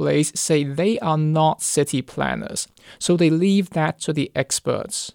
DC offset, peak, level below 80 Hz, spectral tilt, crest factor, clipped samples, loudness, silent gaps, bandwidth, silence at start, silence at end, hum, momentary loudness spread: under 0.1%; -6 dBFS; -54 dBFS; -5 dB/octave; 14 dB; under 0.1%; -21 LUFS; none; 17.5 kHz; 0 s; 0.05 s; none; 8 LU